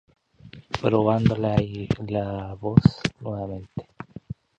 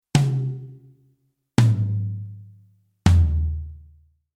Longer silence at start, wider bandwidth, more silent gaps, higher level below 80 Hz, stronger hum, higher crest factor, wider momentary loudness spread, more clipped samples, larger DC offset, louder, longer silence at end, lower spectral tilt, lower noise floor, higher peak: first, 0.45 s vs 0.15 s; second, 8.6 kHz vs 12 kHz; neither; second, -44 dBFS vs -32 dBFS; neither; about the same, 24 dB vs 22 dB; about the same, 19 LU vs 21 LU; neither; neither; about the same, -24 LUFS vs -22 LUFS; second, 0.25 s vs 0.6 s; first, -8 dB/octave vs -6.5 dB/octave; second, -48 dBFS vs -66 dBFS; about the same, -2 dBFS vs -2 dBFS